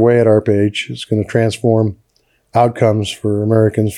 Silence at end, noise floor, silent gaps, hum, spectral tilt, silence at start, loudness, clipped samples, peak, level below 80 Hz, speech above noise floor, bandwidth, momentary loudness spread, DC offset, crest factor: 0 s; -60 dBFS; none; none; -7 dB/octave; 0 s; -15 LUFS; under 0.1%; 0 dBFS; -54 dBFS; 46 dB; 12.5 kHz; 7 LU; under 0.1%; 14 dB